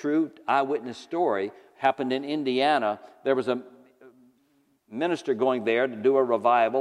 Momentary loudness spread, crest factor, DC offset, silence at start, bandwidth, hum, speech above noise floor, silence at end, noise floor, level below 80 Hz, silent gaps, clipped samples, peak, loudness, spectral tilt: 9 LU; 18 dB; under 0.1%; 0 s; 10.5 kHz; none; 42 dB; 0 s; -67 dBFS; -82 dBFS; none; under 0.1%; -8 dBFS; -26 LUFS; -5.5 dB/octave